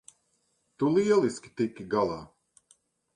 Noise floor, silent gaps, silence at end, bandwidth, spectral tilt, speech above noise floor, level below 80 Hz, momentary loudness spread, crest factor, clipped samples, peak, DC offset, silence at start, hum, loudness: -73 dBFS; none; 0.9 s; 11 kHz; -6 dB/octave; 47 dB; -64 dBFS; 9 LU; 18 dB; under 0.1%; -12 dBFS; under 0.1%; 0.8 s; none; -27 LUFS